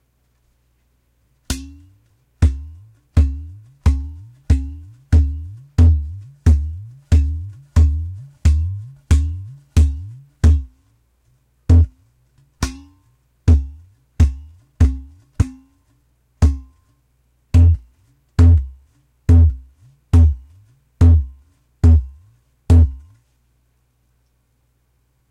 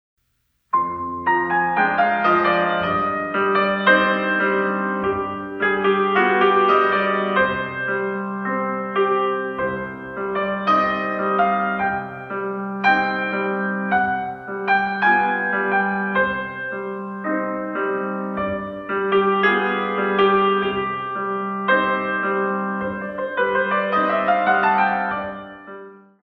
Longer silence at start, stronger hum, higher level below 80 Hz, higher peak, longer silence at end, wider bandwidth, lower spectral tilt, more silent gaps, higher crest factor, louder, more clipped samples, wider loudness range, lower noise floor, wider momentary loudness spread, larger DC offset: first, 1.5 s vs 0.75 s; neither; first, -20 dBFS vs -56 dBFS; about the same, -6 dBFS vs -4 dBFS; first, 2.35 s vs 0.25 s; first, 9.8 kHz vs 6.2 kHz; about the same, -7.5 dB/octave vs -7.5 dB/octave; neither; second, 12 dB vs 18 dB; first, -17 LUFS vs -20 LUFS; neither; about the same, 6 LU vs 4 LU; second, -63 dBFS vs -69 dBFS; first, 19 LU vs 10 LU; neither